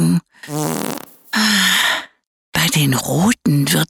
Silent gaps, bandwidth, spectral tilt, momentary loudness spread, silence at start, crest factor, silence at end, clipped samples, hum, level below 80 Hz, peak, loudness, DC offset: 2.27-2.52 s; over 20 kHz; -3.5 dB/octave; 11 LU; 0 s; 14 dB; 0.05 s; under 0.1%; none; -50 dBFS; -2 dBFS; -16 LUFS; under 0.1%